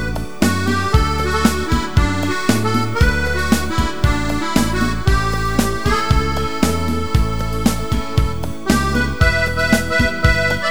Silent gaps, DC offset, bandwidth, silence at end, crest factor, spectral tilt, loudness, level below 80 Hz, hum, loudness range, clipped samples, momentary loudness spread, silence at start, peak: none; 5%; over 20 kHz; 0 s; 18 dB; -5 dB/octave; -18 LUFS; -24 dBFS; none; 2 LU; under 0.1%; 4 LU; 0 s; 0 dBFS